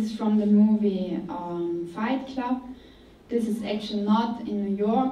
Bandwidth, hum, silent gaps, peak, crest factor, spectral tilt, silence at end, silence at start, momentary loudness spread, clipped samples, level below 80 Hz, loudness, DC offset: 10.5 kHz; none; none; -12 dBFS; 14 dB; -7.5 dB/octave; 0 s; 0 s; 11 LU; under 0.1%; -58 dBFS; -26 LUFS; under 0.1%